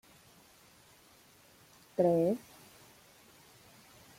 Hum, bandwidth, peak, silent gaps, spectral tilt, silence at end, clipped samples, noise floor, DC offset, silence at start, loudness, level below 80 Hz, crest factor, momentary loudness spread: none; 16.5 kHz; -16 dBFS; none; -7.5 dB/octave; 1.8 s; under 0.1%; -62 dBFS; under 0.1%; 2 s; -31 LUFS; -76 dBFS; 22 dB; 29 LU